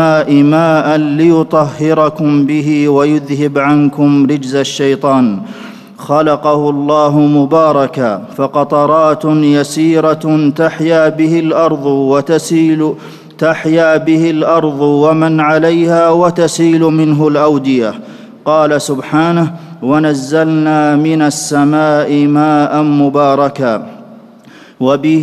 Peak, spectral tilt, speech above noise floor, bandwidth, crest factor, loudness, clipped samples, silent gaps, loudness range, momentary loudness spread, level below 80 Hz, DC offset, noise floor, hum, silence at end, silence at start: 0 dBFS; -6.5 dB/octave; 28 dB; 13 kHz; 10 dB; -10 LUFS; under 0.1%; none; 2 LU; 6 LU; -56 dBFS; under 0.1%; -38 dBFS; none; 0 s; 0 s